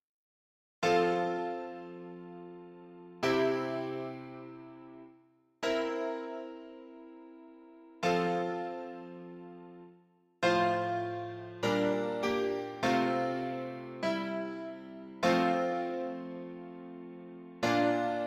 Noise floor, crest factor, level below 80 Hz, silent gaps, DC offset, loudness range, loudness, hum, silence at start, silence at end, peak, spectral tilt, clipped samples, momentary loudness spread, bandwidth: -65 dBFS; 20 dB; -70 dBFS; none; under 0.1%; 6 LU; -33 LUFS; none; 0.8 s; 0 s; -14 dBFS; -5.5 dB/octave; under 0.1%; 22 LU; 15 kHz